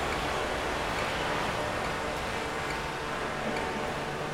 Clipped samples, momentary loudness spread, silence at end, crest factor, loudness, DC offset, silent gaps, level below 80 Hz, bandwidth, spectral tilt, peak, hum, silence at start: under 0.1%; 3 LU; 0 s; 14 dB; -31 LUFS; under 0.1%; none; -46 dBFS; 16 kHz; -4 dB/octave; -18 dBFS; none; 0 s